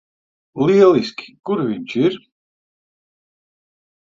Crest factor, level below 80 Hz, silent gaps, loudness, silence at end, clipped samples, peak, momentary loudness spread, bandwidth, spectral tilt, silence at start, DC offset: 20 dB; -64 dBFS; none; -17 LUFS; 2 s; under 0.1%; 0 dBFS; 19 LU; 7.4 kHz; -7 dB/octave; 0.55 s; under 0.1%